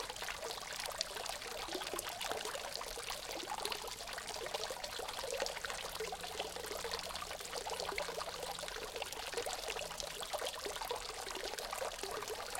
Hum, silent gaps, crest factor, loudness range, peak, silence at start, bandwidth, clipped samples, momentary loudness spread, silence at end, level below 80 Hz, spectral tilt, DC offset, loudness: none; none; 30 dB; 0 LU; -12 dBFS; 0 s; 17 kHz; under 0.1%; 3 LU; 0 s; -62 dBFS; -1 dB/octave; under 0.1%; -41 LUFS